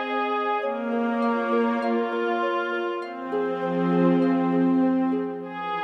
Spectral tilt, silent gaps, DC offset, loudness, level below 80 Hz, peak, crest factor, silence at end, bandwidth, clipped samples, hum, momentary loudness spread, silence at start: -8.5 dB/octave; none; under 0.1%; -24 LUFS; -76 dBFS; -10 dBFS; 14 dB; 0 s; 6 kHz; under 0.1%; none; 8 LU; 0 s